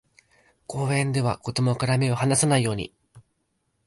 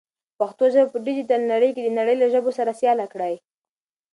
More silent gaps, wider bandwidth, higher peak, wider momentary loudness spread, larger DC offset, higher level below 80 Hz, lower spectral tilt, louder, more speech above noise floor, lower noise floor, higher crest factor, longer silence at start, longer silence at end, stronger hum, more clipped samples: neither; about the same, 11.5 kHz vs 11 kHz; about the same, -8 dBFS vs -6 dBFS; about the same, 11 LU vs 9 LU; neither; first, -54 dBFS vs -78 dBFS; about the same, -5 dB/octave vs -5.5 dB/octave; second, -24 LUFS vs -21 LUFS; second, 50 dB vs over 70 dB; second, -73 dBFS vs under -90 dBFS; about the same, 16 dB vs 16 dB; first, 0.7 s vs 0.4 s; about the same, 0.65 s vs 0.75 s; neither; neither